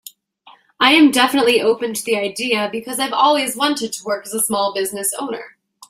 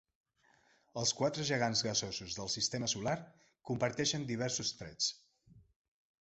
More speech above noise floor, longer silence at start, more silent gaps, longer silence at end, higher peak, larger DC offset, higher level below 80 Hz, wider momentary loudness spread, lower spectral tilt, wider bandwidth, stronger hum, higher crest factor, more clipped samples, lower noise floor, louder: about the same, 32 dB vs 34 dB; second, 0.45 s vs 0.95 s; neither; second, 0.4 s vs 0.6 s; first, 0 dBFS vs -20 dBFS; neither; about the same, -64 dBFS vs -68 dBFS; about the same, 11 LU vs 9 LU; about the same, -2 dB/octave vs -3 dB/octave; first, 16 kHz vs 8.2 kHz; neither; about the same, 18 dB vs 18 dB; neither; second, -49 dBFS vs -71 dBFS; first, -17 LUFS vs -35 LUFS